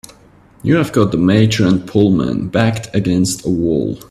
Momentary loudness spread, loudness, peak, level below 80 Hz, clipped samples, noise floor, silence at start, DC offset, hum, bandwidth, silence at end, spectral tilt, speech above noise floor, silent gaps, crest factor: 5 LU; -15 LUFS; 0 dBFS; -42 dBFS; under 0.1%; -46 dBFS; 0.65 s; under 0.1%; none; 14 kHz; 0.1 s; -6 dB/octave; 32 dB; none; 14 dB